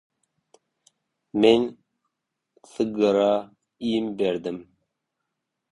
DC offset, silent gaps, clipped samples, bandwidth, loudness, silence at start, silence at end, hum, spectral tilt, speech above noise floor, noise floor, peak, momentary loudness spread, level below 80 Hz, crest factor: under 0.1%; none; under 0.1%; 11 kHz; -23 LUFS; 1.35 s; 1.1 s; none; -6 dB/octave; 59 dB; -81 dBFS; -4 dBFS; 14 LU; -64 dBFS; 22 dB